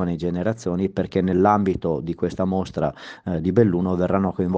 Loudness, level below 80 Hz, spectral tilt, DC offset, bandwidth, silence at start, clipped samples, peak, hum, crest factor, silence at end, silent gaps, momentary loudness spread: -22 LUFS; -48 dBFS; -8.5 dB/octave; under 0.1%; 7.8 kHz; 0 s; under 0.1%; -4 dBFS; none; 18 dB; 0 s; none; 8 LU